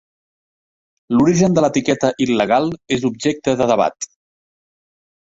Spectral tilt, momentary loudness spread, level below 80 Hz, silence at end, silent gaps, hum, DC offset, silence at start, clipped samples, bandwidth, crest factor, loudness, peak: -5.5 dB/octave; 7 LU; -52 dBFS; 1.15 s; none; none; under 0.1%; 1.1 s; under 0.1%; 8 kHz; 16 dB; -17 LUFS; -2 dBFS